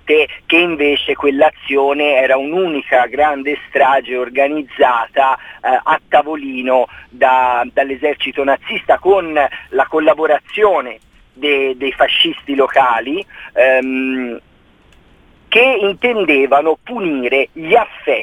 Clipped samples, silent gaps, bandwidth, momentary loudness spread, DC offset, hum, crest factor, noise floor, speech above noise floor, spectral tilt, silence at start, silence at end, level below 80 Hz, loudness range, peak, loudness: under 0.1%; none; 11.5 kHz; 7 LU; under 0.1%; none; 14 dB; -48 dBFS; 34 dB; -5 dB/octave; 0.05 s; 0 s; -50 dBFS; 1 LU; 0 dBFS; -14 LUFS